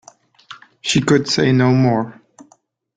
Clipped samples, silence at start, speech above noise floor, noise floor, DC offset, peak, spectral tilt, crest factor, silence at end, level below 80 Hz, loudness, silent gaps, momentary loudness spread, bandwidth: under 0.1%; 0.5 s; 42 dB; -57 dBFS; under 0.1%; -2 dBFS; -5.5 dB/octave; 16 dB; 0.85 s; -52 dBFS; -16 LUFS; none; 10 LU; 9.4 kHz